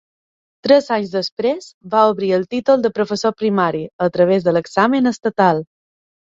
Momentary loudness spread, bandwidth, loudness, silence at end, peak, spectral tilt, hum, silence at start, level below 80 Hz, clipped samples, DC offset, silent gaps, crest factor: 6 LU; 7.8 kHz; -17 LUFS; 0.75 s; 0 dBFS; -6 dB/octave; none; 0.65 s; -60 dBFS; under 0.1%; under 0.1%; 1.32-1.37 s, 1.74-1.81 s, 3.93-3.99 s; 18 dB